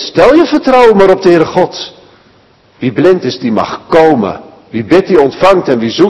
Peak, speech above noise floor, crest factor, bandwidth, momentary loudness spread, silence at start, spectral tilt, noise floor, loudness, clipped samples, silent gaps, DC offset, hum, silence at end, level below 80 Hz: 0 dBFS; 38 dB; 8 dB; 12 kHz; 12 LU; 0 s; -6 dB/octave; -45 dBFS; -8 LUFS; 5%; none; under 0.1%; none; 0 s; -40 dBFS